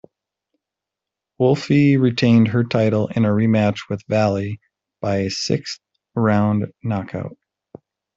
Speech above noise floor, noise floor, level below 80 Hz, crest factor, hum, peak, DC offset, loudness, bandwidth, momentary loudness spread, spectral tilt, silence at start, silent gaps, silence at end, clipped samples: 67 dB; -85 dBFS; -56 dBFS; 16 dB; none; -4 dBFS; under 0.1%; -19 LUFS; 7.8 kHz; 15 LU; -7 dB/octave; 1.4 s; none; 0.85 s; under 0.1%